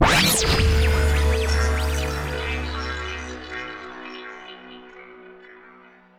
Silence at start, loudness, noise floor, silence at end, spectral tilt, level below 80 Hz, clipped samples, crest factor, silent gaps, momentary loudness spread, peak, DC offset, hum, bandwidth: 0 s; -22 LUFS; -50 dBFS; 0.6 s; -4 dB/octave; -26 dBFS; under 0.1%; 18 dB; none; 23 LU; -4 dBFS; under 0.1%; none; 16 kHz